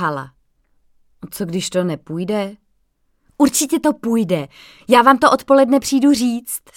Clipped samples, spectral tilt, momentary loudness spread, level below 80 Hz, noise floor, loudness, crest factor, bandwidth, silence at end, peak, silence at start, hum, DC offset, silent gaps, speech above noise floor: under 0.1%; -4.5 dB/octave; 16 LU; -54 dBFS; -63 dBFS; -16 LUFS; 18 dB; 17 kHz; 0.2 s; 0 dBFS; 0 s; none; under 0.1%; none; 47 dB